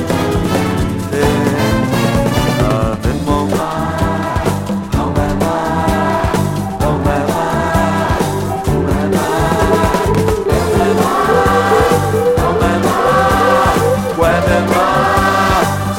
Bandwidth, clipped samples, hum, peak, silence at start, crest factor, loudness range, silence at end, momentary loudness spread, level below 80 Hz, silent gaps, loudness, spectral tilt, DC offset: 17 kHz; under 0.1%; none; 0 dBFS; 0 s; 14 dB; 4 LU; 0 s; 5 LU; -26 dBFS; none; -14 LUFS; -6 dB/octave; under 0.1%